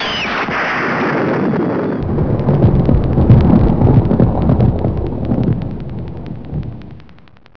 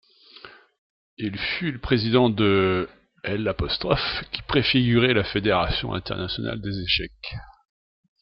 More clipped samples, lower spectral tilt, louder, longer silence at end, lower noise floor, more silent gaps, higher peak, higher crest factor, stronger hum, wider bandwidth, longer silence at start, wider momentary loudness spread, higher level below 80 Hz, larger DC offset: neither; about the same, -8.5 dB/octave vs -9 dB/octave; first, -14 LUFS vs -23 LUFS; second, 0 s vs 0.7 s; second, -38 dBFS vs -48 dBFS; second, none vs 0.78-1.17 s; first, 0 dBFS vs -4 dBFS; second, 14 dB vs 20 dB; neither; second, 5.4 kHz vs 6 kHz; second, 0 s vs 0.45 s; about the same, 15 LU vs 13 LU; first, -24 dBFS vs -42 dBFS; first, 3% vs under 0.1%